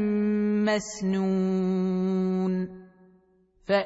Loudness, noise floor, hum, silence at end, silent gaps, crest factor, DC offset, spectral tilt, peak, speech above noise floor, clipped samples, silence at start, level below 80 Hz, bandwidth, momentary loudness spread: -26 LUFS; -62 dBFS; none; 0 s; none; 16 dB; under 0.1%; -6.5 dB/octave; -10 dBFS; 37 dB; under 0.1%; 0 s; -62 dBFS; 8 kHz; 5 LU